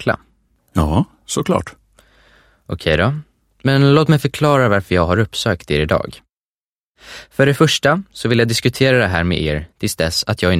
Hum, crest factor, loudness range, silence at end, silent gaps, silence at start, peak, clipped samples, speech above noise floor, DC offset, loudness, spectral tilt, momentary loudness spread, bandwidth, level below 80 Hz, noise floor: none; 16 dB; 5 LU; 0 s; 6.37-6.94 s; 0 s; 0 dBFS; under 0.1%; over 74 dB; under 0.1%; -16 LUFS; -5.5 dB/octave; 11 LU; 16 kHz; -36 dBFS; under -90 dBFS